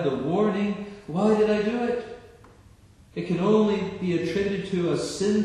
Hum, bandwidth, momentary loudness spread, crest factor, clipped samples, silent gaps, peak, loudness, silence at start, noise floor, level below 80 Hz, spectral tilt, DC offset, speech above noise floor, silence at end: none; 11 kHz; 13 LU; 16 dB; under 0.1%; none; -8 dBFS; -25 LUFS; 0 s; -53 dBFS; -56 dBFS; -6.5 dB/octave; under 0.1%; 28 dB; 0 s